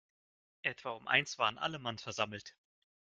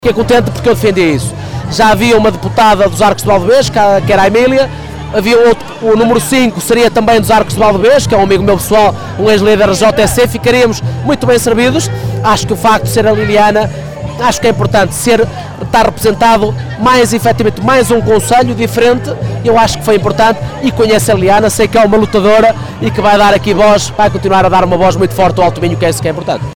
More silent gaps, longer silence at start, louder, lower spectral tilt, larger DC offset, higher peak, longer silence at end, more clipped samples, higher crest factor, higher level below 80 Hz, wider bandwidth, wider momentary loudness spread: neither; first, 0.65 s vs 0 s; second, -35 LUFS vs -9 LUFS; second, -2.5 dB/octave vs -5 dB/octave; second, under 0.1% vs 3%; second, -12 dBFS vs -2 dBFS; first, 0.55 s vs 0 s; neither; first, 26 dB vs 8 dB; second, -76 dBFS vs -30 dBFS; second, 9.4 kHz vs 19.5 kHz; first, 11 LU vs 6 LU